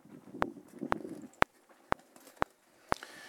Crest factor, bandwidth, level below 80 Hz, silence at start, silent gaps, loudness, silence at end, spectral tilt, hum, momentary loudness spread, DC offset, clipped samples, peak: 38 dB; 18 kHz; -58 dBFS; 0.1 s; none; -37 LUFS; 0 s; -5 dB/octave; none; 13 LU; under 0.1%; under 0.1%; 0 dBFS